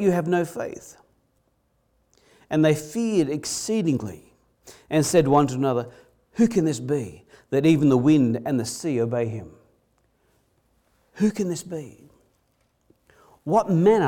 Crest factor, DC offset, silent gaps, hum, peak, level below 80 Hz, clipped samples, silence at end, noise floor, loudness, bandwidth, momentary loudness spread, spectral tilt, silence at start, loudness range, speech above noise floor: 18 dB; under 0.1%; none; none; -6 dBFS; -60 dBFS; under 0.1%; 0 s; -68 dBFS; -23 LUFS; 17.5 kHz; 17 LU; -6 dB/octave; 0 s; 10 LU; 46 dB